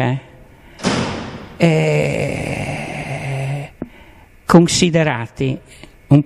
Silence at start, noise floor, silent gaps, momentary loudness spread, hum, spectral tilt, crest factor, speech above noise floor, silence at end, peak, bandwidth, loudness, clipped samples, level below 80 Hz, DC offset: 0 s; -43 dBFS; none; 16 LU; none; -5.5 dB/octave; 18 dB; 28 dB; 0 s; 0 dBFS; 13 kHz; -18 LUFS; under 0.1%; -42 dBFS; under 0.1%